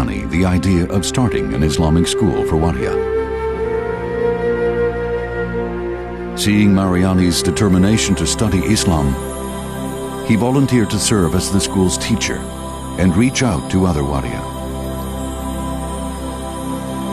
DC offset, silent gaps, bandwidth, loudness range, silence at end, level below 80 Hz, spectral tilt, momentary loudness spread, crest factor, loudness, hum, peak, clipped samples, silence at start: under 0.1%; none; 13.5 kHz; 5 LU; 0 s; -30 dBFS; -5.5 dB/octave; 10 LU; 14 dB; -17 LUFS; none; -4 dBFS; under 0.1%; 0 s